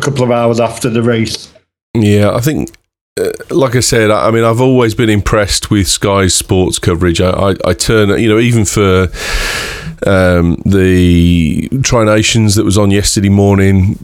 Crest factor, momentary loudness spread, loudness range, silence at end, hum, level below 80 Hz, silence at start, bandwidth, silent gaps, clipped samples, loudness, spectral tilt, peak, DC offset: 10 dB; 7 LU; 3 LU; 0 s; none; -28 dBFS; 0 s; 16.5 kHz; 1.82-1.94 s, 3.01-3.16 s; under 0.1%; -10 LUFS; -5 dB/octave; 0 dBFS; under 0.1%